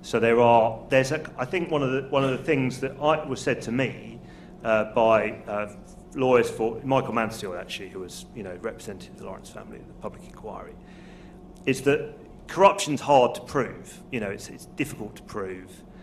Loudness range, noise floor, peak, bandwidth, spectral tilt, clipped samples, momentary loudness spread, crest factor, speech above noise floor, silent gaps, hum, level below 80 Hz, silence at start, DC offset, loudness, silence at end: 13 LU; -45 dBFS; -4 dBFS; 13.5 kHz; -5.5 dB/octave; under 0.1%; 21 LU; 22 dB; 20 dB; none; none; -52 dBFS; 0 s; under 0.1%; -25 LUFS; 0 s